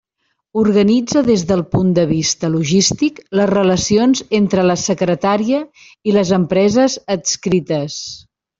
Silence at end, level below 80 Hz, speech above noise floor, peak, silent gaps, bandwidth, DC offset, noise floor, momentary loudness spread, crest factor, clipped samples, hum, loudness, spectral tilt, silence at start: 0.4 s; -46 dBFS; 54 dB; -2 dBFS; none; 7.8 kHz; under 0.1%; -69 dBFS; 7 LU; 14 dB; under 0.1%; none; -15 LUFS; -5 dB/octave; 0.55 s